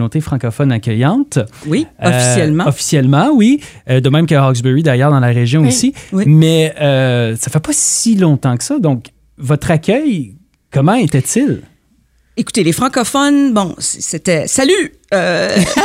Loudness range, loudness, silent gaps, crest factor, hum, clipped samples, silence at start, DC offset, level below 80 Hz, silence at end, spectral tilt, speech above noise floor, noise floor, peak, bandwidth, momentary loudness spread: 4 LU; -13 LUFS; none; 12 dB; none; under 0.1%; 0 s; under 0.1%; -46 dBFS; 0 s; -5 dB/octave; 42 dB; -54 dBFS; 0 dBFS; 16 kHz; 7 LU